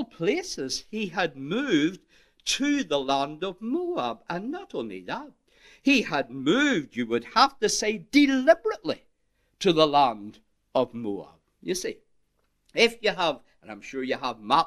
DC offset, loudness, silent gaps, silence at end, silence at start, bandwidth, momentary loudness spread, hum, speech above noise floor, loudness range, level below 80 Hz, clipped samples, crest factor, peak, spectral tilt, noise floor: under 0.1%; -26 LUFS; none; 0 s; 0 s; 13.5 kHz; 14 LU; none; 45 dB; 6 LU; -60 dBFS; under 0.1%; 22 dB; -4 dBFS; -3.5 dB/octave; -70 dBFS